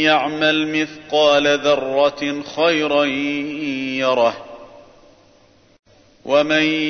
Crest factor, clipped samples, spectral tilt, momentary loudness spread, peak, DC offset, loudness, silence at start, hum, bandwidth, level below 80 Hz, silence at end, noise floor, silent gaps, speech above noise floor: 16 dB; under 0.1%; -4 dB/octave; 9 LU; -2 dBFS; under 0.1%; -18 LUFS; 0 s; none; 6.6 kHz; -58 dBFS; 0 s; -52 dBFS; 5.79-5.83 s; 35 dB